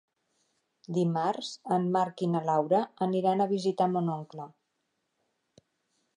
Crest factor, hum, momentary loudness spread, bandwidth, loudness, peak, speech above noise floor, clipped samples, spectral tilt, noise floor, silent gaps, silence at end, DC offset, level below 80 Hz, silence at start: 18 dB; none; 10 LU; 10.5 kHz; -29 LUFS; -12 dBFS; 51 dB; under 0.1%; -7 dB/octave; -80 dBFS; none; 1.7 s; under 0.1%; -82 dBFS; 0.9 s